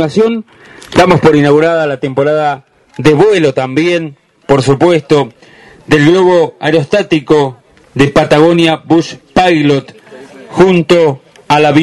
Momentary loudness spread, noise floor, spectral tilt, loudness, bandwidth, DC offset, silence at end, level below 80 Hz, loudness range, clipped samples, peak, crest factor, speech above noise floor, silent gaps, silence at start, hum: 8 LU; -33 dBFS; -6.5 dB/octave; -10 LUFS; 12 kHz; under 0.1%; 0 s; -40 dBFS; 2 LU; 0.4%; 0 dBFS; 10 dB; 24 dB; none; 0 s; none